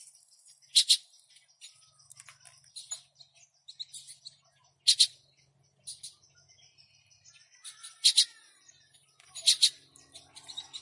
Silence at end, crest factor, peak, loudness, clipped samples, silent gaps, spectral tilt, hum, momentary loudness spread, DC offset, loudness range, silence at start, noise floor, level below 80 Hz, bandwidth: 0.05 s; 26 dB; -8 dBFS; -24 LUFS; under 0.1%; none; 4.5 dB/octave; none; 25 LU; under 0.1%; 18 LU; 0.75 s; -68 dBFS; under -90 dBFS; 11.5 kHz